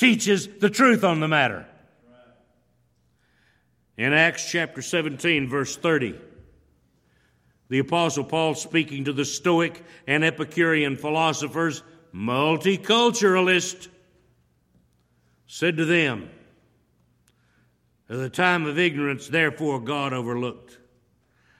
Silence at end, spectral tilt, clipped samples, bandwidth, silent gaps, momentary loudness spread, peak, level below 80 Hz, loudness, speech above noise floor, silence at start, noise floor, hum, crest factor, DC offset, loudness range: 1.05 s; -4 dB/octave; under 0.1%; 16 kHz; none; 12 LU; -2 dBFS; -64 dBFS; -22 LUFS; 43 dB; 0 s; -66 dBFS; none; 22 dB; under 0.1%; 5 LU